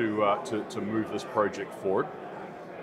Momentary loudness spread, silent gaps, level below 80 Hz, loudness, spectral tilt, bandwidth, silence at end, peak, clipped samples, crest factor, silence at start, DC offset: 14 LU; none; -70 dBFS; -30 LUFS; -6 dB/octave; 14 kHz; 0 s; -10 dBFS; under 0.1%; 20 dB; 0 s; under 0.1%